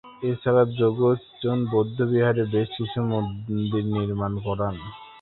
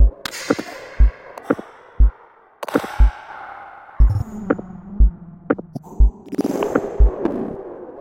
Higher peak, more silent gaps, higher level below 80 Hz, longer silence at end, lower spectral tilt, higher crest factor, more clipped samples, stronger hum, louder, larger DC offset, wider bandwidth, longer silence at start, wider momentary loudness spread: second, -6 dBFS vs 0 dBFS; neither; second, -52 dBFS vs -20 dBFS; about the same, 0 s vs 0 s; first, -12 dB/octave vs -7 dB/octave; about the same, 18 dB vs 18 dB; neither; neither; second, -24 LUFS vs -21 LUFS; neither; second, 4.2 kHz vs 9.4 kHz; about the same, 0.05 s vs 0 s; second, 8 LU vs 16 LU